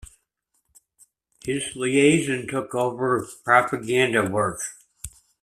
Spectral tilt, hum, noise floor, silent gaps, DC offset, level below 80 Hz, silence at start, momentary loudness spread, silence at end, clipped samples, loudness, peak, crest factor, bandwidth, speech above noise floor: -4.5 dB/octave; none; -73 dBFS; none; under 0.1%; -56 dBFS; 1.45 s; 18 LU; 0.35 s; under 0.1%; -22 LUFS; -2 dBFS; 22 dB; 14.5 kHz; 51 dB